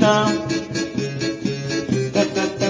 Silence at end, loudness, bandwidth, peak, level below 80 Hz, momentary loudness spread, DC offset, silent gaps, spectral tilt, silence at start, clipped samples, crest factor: 0 s; -22 LUFS; 7.6 kHz; 0 dBFS; -50 dBFS; 6 LU; under 0.1%; none; -5 dB/octave; 0 s; under 0.1%; 20 dB